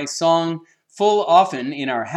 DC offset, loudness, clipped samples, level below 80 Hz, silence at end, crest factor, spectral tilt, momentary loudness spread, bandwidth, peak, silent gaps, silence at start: under 0.1%; -18 LUFS; under 0.1%; -78 dBFS; 0 s; 16 dB; -4.5 dB/octave; 11 LU; 12 kHz; -2 dBFS; none; 0 s